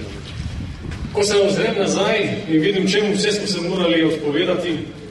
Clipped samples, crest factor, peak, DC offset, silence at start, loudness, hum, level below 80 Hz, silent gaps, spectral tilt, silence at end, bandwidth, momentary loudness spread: under 0.1%; 14 dB; -6 dBFS; under 0.1%; 0 s; -19 LUFS; none; -40 dBFS; none; -4.5 dB/octave; 0 s; 11.5 kHz; 13 LU